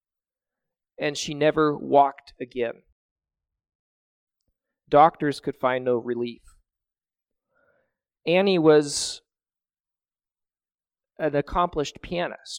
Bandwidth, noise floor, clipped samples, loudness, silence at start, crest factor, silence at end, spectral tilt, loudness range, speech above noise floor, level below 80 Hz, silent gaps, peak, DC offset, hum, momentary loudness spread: 15.5 kHz; under -90 dBFS; under 0.1%; -23 LUFS; 1 s; 22 dB; 0 s; -4.5 dB/octave; 5 LU; over 67 dB; -54 dBFS; 2.92-3.16 s, 3.75-4.27 s, 9.80-9.84 s; -4 dBFS; under 0.1%; none; 13 LU